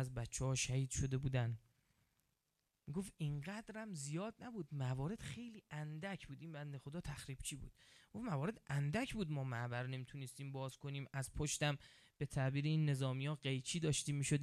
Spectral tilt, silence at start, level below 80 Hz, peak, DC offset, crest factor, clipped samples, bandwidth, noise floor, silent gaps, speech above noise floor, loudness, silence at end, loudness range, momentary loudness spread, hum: -5 dB/octave; 0 s; -62 dBFS; -24 dBFS; under 0.1%; 20 dB; under 0.1%; 14 kHz; -87 dBFS; none; 44 dB; -43 LUFS; 0 s; 7 LU; 11 LU; none